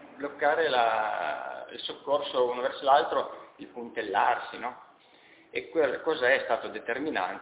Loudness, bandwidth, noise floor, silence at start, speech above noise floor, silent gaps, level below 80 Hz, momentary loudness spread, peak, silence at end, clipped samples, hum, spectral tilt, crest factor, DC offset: -28 LUFS; 4 kHz; -57 dBFS; 0 s; 29 dB; none; -72 dBFS; 14 LU; -8 dBFS; 0 s; under 0.1%; none; -7 dB/octave; 20 dB; under 0.1%